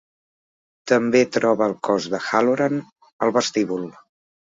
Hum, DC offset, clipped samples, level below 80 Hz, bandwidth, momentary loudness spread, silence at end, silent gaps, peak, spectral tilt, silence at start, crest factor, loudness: none; under 0.1%; under 0.1%; -66 dBFS; 7.8 kHz; 11 LU; 0.7 s; 2.92-2.96 s, 3.12-3.19 s; -2 dBFS; -4.5 dB/octave; 0.85 s; 20 dB; -21 LUFS